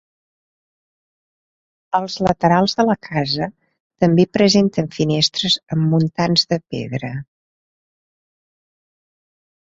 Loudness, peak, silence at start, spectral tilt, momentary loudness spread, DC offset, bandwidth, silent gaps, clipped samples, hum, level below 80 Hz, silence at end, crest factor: -18 LUFS; -2 dBFS; 1.95 s; -5.5 dB/octave; 11 LU; under 0.1%; 7.8 kHz; 3.80-3.90 s; under 0.1%; none; -54 dBFS; 2.5 s; 18 dB